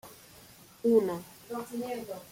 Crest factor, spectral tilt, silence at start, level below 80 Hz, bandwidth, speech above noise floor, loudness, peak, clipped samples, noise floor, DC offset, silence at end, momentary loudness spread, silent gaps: 20 dB; -6 dB/octave; 0.05 s; -70 dBFS; 16.5 kHz; 25 dB; -31 LUFS; -12 dBFS; under 0.1%; -55 dBFS; under 0.1%; 0.05 s; 25 LU; none